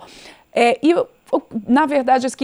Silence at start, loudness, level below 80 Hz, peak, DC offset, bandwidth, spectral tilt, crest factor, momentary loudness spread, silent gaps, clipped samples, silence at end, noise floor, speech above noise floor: 0.25 s; -18 LUFS; -58 dBFS; -2 dBFS; under 0.1%; 12 kHz; -4.5 dB/octave; 16 dB; 8 LU; none; under 0.1%; 0 s; -43 dBFS; 27 dB